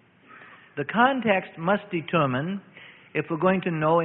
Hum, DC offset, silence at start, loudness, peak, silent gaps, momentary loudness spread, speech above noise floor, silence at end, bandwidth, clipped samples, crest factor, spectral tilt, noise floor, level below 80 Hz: none; under 0.1%; 0.3 s; -25 LUFS; -6 dBFS; none; 12 LU; 26 dB; 0 s; 4.1 kHz; under 0.1%; 20 dB; -11 dB/octave; -50 dBFS; -64 dBFS